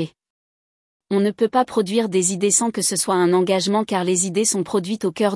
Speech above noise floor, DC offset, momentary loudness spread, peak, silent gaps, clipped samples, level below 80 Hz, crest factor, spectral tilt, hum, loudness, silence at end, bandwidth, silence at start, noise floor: over 71 dB; under 0.1%; 5 LU; -4 dBFS; 0.30-1.00 s; under 0.1%; -66 dBFS; 18 dB; -4 dB/octave; none; -19 LUFS; 0 s; 12 kHz; 0 s; under -90 dBFS